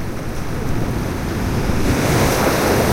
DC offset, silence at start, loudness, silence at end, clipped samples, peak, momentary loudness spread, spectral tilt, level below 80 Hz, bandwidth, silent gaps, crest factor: under 0.1%; 0 s; -19 LUFS; 0 s; under 0.1%; -2 dBFS; 9 LU; -5 dB/octave; -26 dBFS; 16 kHz; none; 16 dB